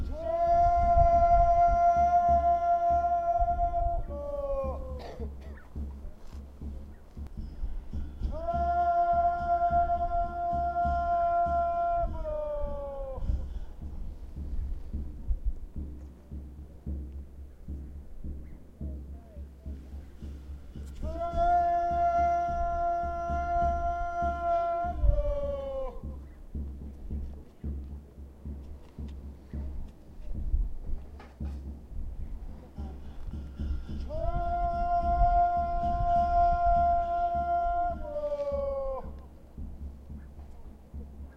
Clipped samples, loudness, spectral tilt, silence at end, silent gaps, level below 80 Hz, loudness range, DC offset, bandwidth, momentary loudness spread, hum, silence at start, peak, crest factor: under 0.1%; -29 LUFS; -8.5 dB/octave; 0 s; none; -36 dBFS; 16 LU; under 0.1%; 6.4 kHz; 21 LU; none; 0 s; -10 dBFS; 20 dB